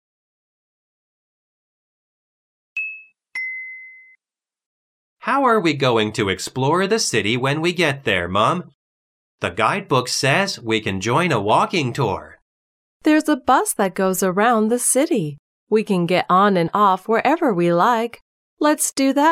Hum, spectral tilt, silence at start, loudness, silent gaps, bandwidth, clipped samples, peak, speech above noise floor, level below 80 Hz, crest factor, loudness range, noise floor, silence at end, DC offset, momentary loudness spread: none; -4 dB/octave; 2.75 s; -19 LUFS; 4.66-5.17 s, 8.74-9.38 s, 12.42-13.00 s, 15.39-15.67 s, 18.22-18.57 s; 16 kHz; under 0.1%; -2 dBFS; over 72 dB; -62 dBFS; 18 dB; 14 LU; under -90 dBFS; 0 s; under 0.1%; 10 LU